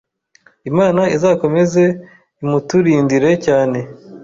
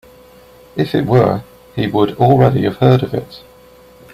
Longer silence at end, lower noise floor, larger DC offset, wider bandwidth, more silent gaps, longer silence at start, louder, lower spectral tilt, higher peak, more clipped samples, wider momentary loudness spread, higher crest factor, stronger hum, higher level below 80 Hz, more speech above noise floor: second, 0 s vs 0.75 s; first, -53 dBFS vs -43 dBFS; neither; second, 7.8 kHz vs 14.5 kHz; neither; about the same, 0.65 s vs 0.75 s; about the same, -15 LUFS vs -14 LUFS; second, -7 dB/octave vs -8.5 dB/octave; about the same, -2 dBFS vs 0 dBFS; neither; about the same, 12 LU vs 14 LU; about the same, 12 dB vs 16 dB; neither; second, -52 dBFS vs -44 dBFS; first, 39 dB vs 30 dB